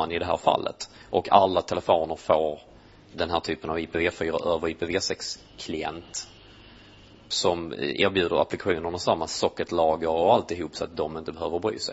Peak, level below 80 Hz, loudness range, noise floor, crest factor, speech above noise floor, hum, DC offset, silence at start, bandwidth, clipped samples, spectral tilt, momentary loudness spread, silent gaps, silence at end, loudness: -2 dBFS; -54 dBFS; 5 LU; -51 dBFS; 24 dB; 25 dB; none; under 0.1%; 0 s; 8 kHz; under 0.1%; -4 dB/octave; 11 LU; none; 0 s; -26 LUFS